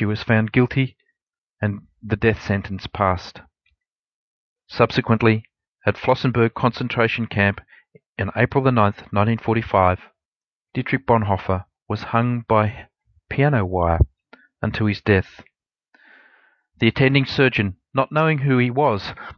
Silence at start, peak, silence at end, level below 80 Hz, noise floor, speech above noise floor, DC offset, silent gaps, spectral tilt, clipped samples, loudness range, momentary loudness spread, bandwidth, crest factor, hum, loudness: 0 s; -2 dBFS; 0.05 s; -40 dBFS; under -90 dBFS; over 71 dB; under 0.1%; 1.23-1.27 s, 1.38-1.57 s, 3.90-4.04 s, 4.14-4.56 s, 5.68-5.75 s, 8.06-8.13 s, 10.25-10.40 s, 10.47-10.65 s; -8 dB/octave; under 0.1%; 4 LU; 11 LU; 6.6 kHz; 20 dB; none; -20 LUFS